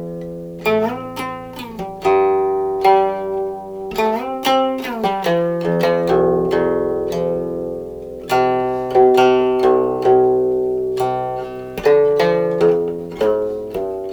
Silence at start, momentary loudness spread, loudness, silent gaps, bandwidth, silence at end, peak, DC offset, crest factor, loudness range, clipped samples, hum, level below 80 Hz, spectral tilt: 0 s; 13 LU; -17 LUFS; none; over 20 kHz; 0 s; 0 dBFS; under 0.1%; 16 dB; 3 LU; under 0.1%; none; -46 dBFS; -6.5 dB/octave